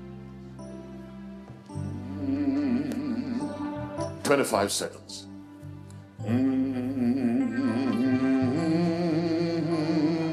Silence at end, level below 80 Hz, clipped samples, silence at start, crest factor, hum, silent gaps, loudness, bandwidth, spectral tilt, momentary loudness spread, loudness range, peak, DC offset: 0 s; -60 dBFS; under 0.1%; 0 s; 18 dB; none; none; -27 LUFS; 14 kHz; -6 dB/octave; 18 LU; 6 LU; -10 dBFS; under 0.1%